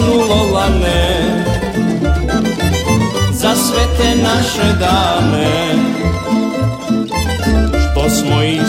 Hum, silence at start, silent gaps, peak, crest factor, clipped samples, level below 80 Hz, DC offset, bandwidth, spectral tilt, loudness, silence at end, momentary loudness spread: none; 0 s; none; 0 dBFS; 12 dB; under 0.1%; -22 dBFS; under 0.1%; 16.5 kHz; -5 dB/octave; -14 LUFS; 0 s; 4 LU